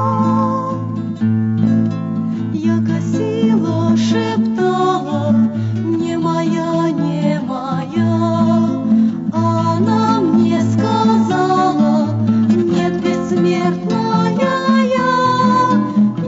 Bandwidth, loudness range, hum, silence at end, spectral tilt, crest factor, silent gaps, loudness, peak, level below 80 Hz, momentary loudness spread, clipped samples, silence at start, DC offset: 7.8 kHz; 3 LU; none; 0 s; -7.5 dB/octave; 14 dB; none; -15 LUFS; -2 dBFS; -54 dBFS; 5 LU; under 0.1%; 0 s; under 0.1%